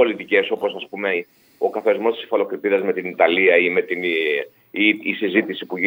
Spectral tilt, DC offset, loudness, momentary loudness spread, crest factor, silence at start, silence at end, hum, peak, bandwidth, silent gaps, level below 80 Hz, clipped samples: -6.5 dB/octave; under 0.1%; -20 LUFS; 10 LU; 18 dB; 0 s; 0 s; none; -2 dBFS; 16 kHz; none; -76 dBFS; under 0.1%